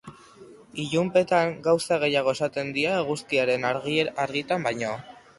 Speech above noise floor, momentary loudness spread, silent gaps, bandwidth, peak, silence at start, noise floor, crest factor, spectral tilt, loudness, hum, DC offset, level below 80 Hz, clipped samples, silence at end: 24 dB; 7 LU; none; 11.5 kHz; -8 dBFS; 0.05 s; -49 dBFS; 18 dB; -4.5 dB/octave; -25 LUFS; none; under 0.1%; -64 dBFS; under 0.1%; 0.25 s